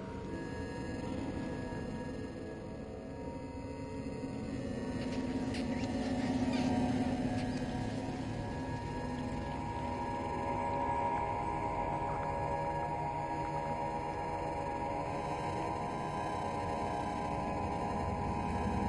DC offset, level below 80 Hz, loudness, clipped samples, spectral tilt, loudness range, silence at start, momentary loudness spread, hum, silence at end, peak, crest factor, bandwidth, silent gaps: under 0.1%; -50 dBFS; -37 LUFS; under 0.1%; -6.5 dB/octave; 6 LU; 0 s; 8 LU; none; 0 s; -22 dBFS; 16 dB; 11.5 kHz; none